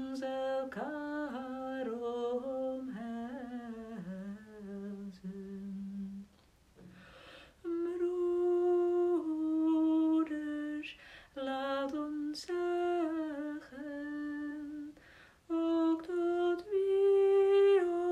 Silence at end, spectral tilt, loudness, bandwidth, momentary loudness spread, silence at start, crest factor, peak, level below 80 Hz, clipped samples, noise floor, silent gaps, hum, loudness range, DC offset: 0 s; -6.5 dB/octave; -34 LUFS; 10 kHz; 16 LU; 0 s; 14 dB; -20 dBFS; -70 dBFS; under 0.1%; -65 dBFS; none; none; 12 LU; under 0.1%